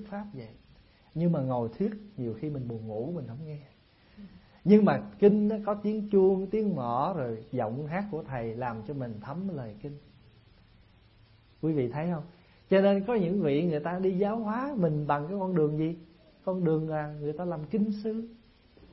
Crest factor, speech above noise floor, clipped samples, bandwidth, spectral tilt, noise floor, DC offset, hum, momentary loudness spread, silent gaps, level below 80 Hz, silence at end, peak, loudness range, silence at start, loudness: 22 dB; 31 dB; under 0.1%; 5.8 kHz; -12 dB/octave; -59 dBFS; under 0.1%; none; 16 LU; none; -62 dBFS; 0.55 s; -8 dBFS; 11 LU; 0 s; -29 LUFS